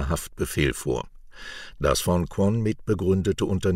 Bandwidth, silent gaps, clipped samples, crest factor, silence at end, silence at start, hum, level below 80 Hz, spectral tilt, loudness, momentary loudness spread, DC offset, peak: 16 kHz; none; under 0.1%; 18 dB; 0 s; 0 s; none; -38 dBFS; -5.5 dB/octave; -25 LUFS; 16 LU; under 0.1%; -8 dBFS